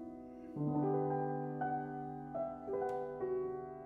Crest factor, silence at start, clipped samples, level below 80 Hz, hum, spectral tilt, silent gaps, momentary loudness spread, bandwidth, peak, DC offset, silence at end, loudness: 14 dB; 0 s; under 0.1%; -70 dBFS; none; -10.5 dB/octave; none; 9 LU; 3.7 kHz; -26 dBFS; under 0.1%; 0 s; -39 LUFS